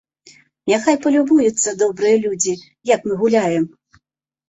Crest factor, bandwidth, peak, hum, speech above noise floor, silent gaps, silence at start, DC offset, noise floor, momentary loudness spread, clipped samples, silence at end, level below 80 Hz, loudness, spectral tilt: 16 dB; 8.2 kHz; -2 dBFS; none; 51 dB; none; 0.65 s; under 0.1%; -67 dBFS; 7 LU; under 0.1%; 0.8 s; -60 dBFS; -17 LUFS; -4 dB/octave